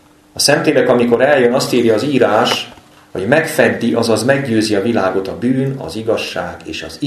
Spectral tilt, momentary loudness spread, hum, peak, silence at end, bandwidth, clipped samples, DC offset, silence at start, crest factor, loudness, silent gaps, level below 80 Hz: -4.5 dB/octave; 12 LU; none; 0 dBFS; 0 s; 13.5 kHz; under 0.1%; under 0.1%; 0.35 s; 14 dB; -14 LUFS; none; -50 dBFS